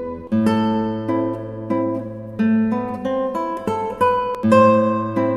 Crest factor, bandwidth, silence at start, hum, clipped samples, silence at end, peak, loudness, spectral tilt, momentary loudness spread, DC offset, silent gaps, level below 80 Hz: 18 dB; 12 kHz; 0 s; none; under 0.1%; 0 s; -2 dBFS; -19 LUFS; -8 dB/octave; 10 LU; under 0.1%; none; -52 dBFS